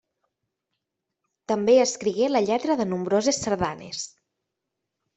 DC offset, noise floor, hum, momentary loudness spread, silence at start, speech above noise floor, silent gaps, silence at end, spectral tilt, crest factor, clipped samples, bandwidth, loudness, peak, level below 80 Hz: under 0.1%; -83 dBFS; none; 14 LU; 1.5 s; 60 dB; none; 1.1 s; -4 dB/octave; 18 dB; under 0.1%; 8.4 kHz; -23 LUFS; -8 dBFS; -60 dBFS